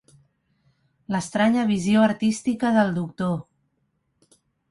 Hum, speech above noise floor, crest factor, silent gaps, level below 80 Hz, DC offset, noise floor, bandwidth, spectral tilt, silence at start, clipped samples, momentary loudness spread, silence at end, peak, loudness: none; 50 dB; 18 dB; none; -60 dBFS; under 0.1%; -72 dBFS; 11.5 kHz; -6 dB/octave; 1.1 s; under 0.1%; 9 LU; 1.3 s; -6 dBFS; -22 LUFS